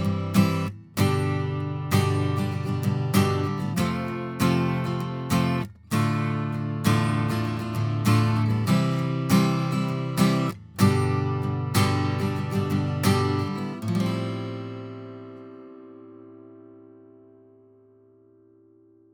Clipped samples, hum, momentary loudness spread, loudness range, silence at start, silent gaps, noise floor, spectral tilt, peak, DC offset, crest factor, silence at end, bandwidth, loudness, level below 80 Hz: under 0.1%; none; 9 LU; 9 LU; 0 s; none; -56 dBFS; -6.5 dB/octave; -6 dBFS; under 0.1%; 18 dB; 2.35 s; over 20 kHz; -25 LUFS; -56 dBFS